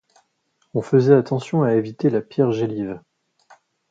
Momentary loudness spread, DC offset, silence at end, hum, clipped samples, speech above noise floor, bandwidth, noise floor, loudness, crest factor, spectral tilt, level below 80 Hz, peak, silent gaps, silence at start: 13 LU; under 0.1%; 0.95 s; none; under 0.1%; 49 dB; 7.8 kHz; -68 dBFS; -20 LUFS; 20 dB; -8.5 dB/octave; -62 dBFS; -2 dBFS; none; 0.75 s